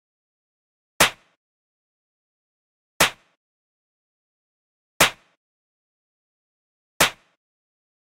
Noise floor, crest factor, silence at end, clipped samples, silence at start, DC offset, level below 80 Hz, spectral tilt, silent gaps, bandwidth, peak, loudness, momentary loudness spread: under -90 dBFS; 26 dB; 1 s; under 0.1%; 1 s; under 0.1%; -56 dBFS; -1 dB/octave; 1.37-3.00 s, 3.37-5.00 s, 5.37-7.00 s; 16 kHz; -2 dBFS; -20 LUFS; 1 LU